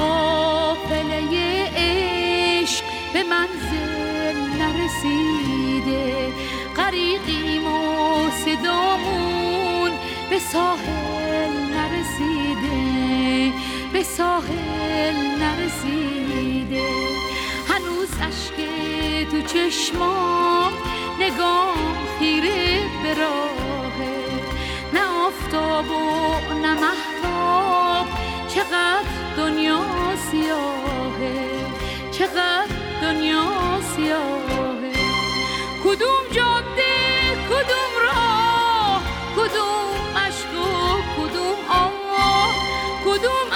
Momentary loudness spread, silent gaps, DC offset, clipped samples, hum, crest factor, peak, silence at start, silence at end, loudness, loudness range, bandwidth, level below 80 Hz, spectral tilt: 6 LU; none; under 0.1%; under 0.1%; none; 16 dB; -6 dBFS; 0 s; 0 s; -21 LUFS; 4 LU; 19.5 kHz; -38 dBFS; -4 dB/octave